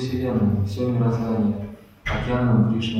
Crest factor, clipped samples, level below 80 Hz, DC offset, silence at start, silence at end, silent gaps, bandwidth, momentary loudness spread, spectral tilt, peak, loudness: 14 dB; under 0.1%; -40 dBFS; under 0.1%; 0 s; 0 s; none; 8.6 kHz; 11 LU; -8 dB/octave; -8 dBFS; -22 LUFS